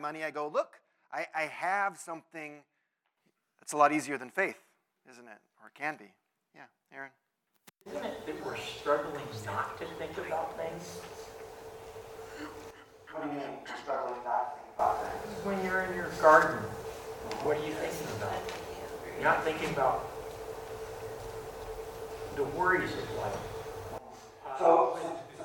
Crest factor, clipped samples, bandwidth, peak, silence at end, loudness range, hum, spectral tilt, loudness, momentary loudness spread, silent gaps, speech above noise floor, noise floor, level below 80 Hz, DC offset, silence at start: 26 dB; under 0.1%; 18 kHz; -8 dBFS; 0 s; 12 LU; none; -4.5 dB/octave; -33 LUFS; 20 LU; none; 48 dB; -80 dBFS; -60 dBFS; under 0.1%; 0 s